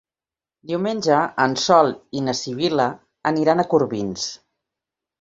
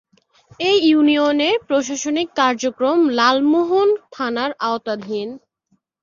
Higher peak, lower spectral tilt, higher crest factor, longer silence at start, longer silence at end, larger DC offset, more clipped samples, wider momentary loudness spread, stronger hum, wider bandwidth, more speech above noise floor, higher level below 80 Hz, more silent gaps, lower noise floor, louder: about the same, -2 dBFS vs -2 dBFS; first, -4.5 dB/octave vs -3 dB/octave; about the same, 20 dB vs 16 dB; about the same, 0.65 s vs 0.6 s; first, 0.85 s vs 0.65 s; neither; neither; about the same, 10 LU vs 10 LU; neither; about the same, 8 kHz vs 7.4 kHz; first, over 70 dB vs 48 dB; about the same, -60 dBFS vs -64 dBFS; neither; first, under -90 dBFS vs -66 dBFS; about the same, -20 LUFS vs -18 LUFS